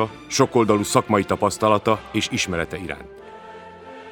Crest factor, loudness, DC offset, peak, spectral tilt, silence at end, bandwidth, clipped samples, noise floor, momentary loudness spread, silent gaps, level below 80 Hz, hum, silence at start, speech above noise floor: 22 dB; -21 LUFS; under 0.1%; 0 dBFS; -4.5 dB/octave; 0 s; over 20 kHz; under 0.1%; -40 dBFS; 22 LU; none; -50 dBFS; none; 0 s; 19 dB